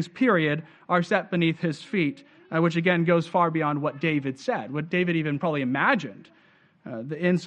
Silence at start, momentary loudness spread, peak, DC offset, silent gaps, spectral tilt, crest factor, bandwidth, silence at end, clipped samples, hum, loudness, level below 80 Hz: 0 s; 8 LU; -6 dBFS; under 0.1%; none; -7 dB/octave; 18 dB; 8.8 kHz; 0 s; under 0.1%; none; -25 LUFS; -68 dBFS